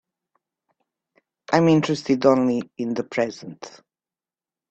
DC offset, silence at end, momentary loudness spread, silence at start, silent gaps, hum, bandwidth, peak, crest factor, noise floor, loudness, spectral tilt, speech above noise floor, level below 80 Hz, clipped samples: under 0.1%; 1 s; 20 LU; 1.5 s; none; none; 8.4 kHz; -2 dBFS; 22 dB; under -90 dBFS; -21 LUFS; -6.5 dB/octave; over 69 dB; -64 dBFS; under 0.1%